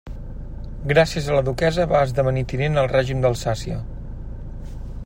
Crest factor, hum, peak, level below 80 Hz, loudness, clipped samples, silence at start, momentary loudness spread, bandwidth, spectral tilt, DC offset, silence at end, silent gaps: 18 dB; none; -4 dBFS; -32 dBFS; -21 LUFS; under 0.1%; 0.05 s; 18 LU; 16 kHz; -6 dB/octave; under 0.1%; 0 s; none